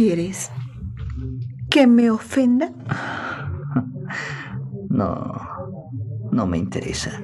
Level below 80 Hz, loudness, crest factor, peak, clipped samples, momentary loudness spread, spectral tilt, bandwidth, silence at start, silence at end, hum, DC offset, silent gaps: -44 dBFS; -22 LUFS; 20 dB; -2 dBFS; under 0.1%; 15 LU; -6 dB/octave; 12 kHz; 0 s; 0 s; none; under 0.1%; none